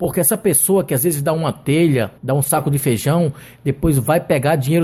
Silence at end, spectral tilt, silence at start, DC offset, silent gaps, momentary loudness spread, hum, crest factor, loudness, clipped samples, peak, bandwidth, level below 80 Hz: 0 s; -5.5 dB/octave; 0 s; under 0.1%; none; 6 LU; none; 16 dB; -17 LUFS; under 0.1%; -2 dBFS; 16.5 kHz; -40 dBFS